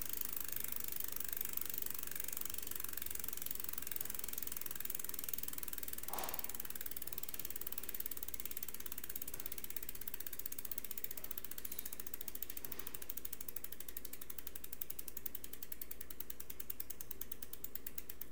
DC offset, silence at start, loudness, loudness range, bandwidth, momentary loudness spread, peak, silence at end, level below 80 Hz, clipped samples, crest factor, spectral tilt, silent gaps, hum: 0.7%; 0 s; -43 LUFS; 5 LU; 19 kHz; 6 LU; -18 dBFS; 0 s; -64 dBFS; under 0.1%; 28 dB; -1.5 dB/octave; none; none